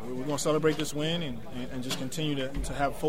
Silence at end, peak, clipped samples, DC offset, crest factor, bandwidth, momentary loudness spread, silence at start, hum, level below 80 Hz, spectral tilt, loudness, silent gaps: 0 s; -12 dBFS; under 0.1%; 1%; 18 dB; 16 kHz; 10 LU; 0 s; none; -44 dBFS; -4.5 dB/octave; -31 LUFS; none